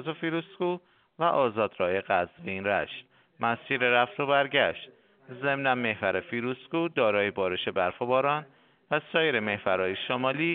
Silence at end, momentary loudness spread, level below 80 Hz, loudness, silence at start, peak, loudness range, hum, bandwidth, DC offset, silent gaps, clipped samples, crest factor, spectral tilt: 0 s; 8 LU; -70 dBFS; -28 LUFS; 0 s; -8 dBFS; 2 LU; none; 4.5 kHz; under 0.1%; none; under 0.1%; 20 dB; -2.5 dB/octave